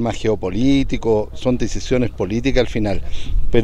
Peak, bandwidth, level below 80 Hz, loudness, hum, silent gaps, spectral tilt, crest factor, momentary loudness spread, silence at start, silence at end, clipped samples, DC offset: 0 dBFS; 8.4 kHz; -24 dBFS; -20 LUFS; none; none; -6.5 dB/octave; 16 dB; 6 LU; 0 s; 0 s; under 0.1%; under 0.1%